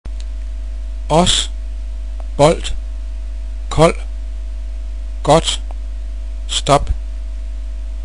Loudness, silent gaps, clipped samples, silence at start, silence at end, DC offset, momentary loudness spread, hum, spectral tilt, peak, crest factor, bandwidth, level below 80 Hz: -19 LUFS; none; under 0.1%; 0.05 s; 0 s; 3%; 15 LU; none; -4.5 dB/octave; 0 dBFS; 18 dB; 10.5 kHz; -24 dBFS